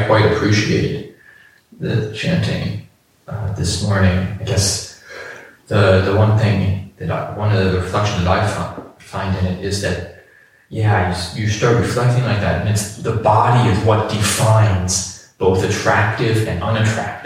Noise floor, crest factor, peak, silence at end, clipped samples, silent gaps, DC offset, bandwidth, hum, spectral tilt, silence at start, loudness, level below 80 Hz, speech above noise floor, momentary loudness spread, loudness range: -49 dBFS; 16 dB; -2 dBFS; 0 s; under 0.1%; none; under 0.1%; 14.5 kHz; none; -5 dB/octave; 0 s; -17 LUFS; -40 dBFS; 33 dB; 14 LU; 5 LU